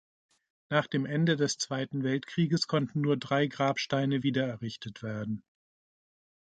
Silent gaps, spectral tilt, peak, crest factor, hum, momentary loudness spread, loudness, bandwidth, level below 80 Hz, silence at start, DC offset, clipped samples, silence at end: none; -5.5 dB/octave; -10 dBFS; 20 dB; none; 10 LU; -30 LUFS; 9.2 kHz; -70 dBFS; 0.7 s; under 0.1%; under 0.1%; 1.15 s